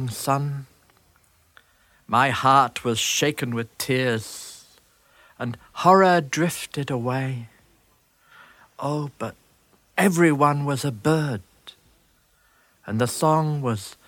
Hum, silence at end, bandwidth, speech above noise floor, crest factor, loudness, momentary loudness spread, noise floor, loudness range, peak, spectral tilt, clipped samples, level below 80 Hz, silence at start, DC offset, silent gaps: none; 0.15 s; 18 kHz; 40 dB; 22 dB; -22 LUFS; 16 LU; -62 dBFS; 5 LU; -2 dBFS; -5 dB/octave; under 0.1%; -62 dBFS; 0 s; under 0.1%; none